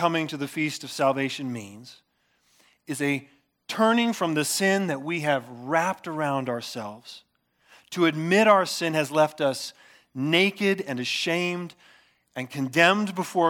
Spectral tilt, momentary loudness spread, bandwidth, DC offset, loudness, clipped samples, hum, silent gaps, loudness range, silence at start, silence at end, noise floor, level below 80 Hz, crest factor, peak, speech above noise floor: -4.5 dB/octave; 16 LU; 19 kHz; under 0.1%; -24 LUFS; under 0.1%; none; none; 6 LU; 0 s; 0 s; -68 dBFS; -80 dBFS; 22 dB; -4 dBFS; 43 dB